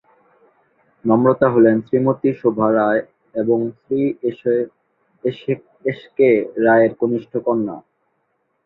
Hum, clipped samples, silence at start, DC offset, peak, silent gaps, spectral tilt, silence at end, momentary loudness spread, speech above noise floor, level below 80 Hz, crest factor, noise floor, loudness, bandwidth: none; under 0.1%; 1.05 s; under 0.1%; 0 dBFS; none; -10.5 dB/octave; 0.85 s; 12 LU; 51 dB; -60 dBFS; 18 dB; -68 dBFS; -18 LUFS; 4.1 kHz